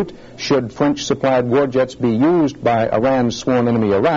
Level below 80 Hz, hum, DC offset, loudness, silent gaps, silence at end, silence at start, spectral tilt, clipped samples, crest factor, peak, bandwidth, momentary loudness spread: -48 dBFS; none; under 0.1%; -17 LUFS; none; 0 s; 0 s; -5.5 dB/octave; under 0.1%; 14 dB; -2 dBFS; 7.8 kHz; 4 LU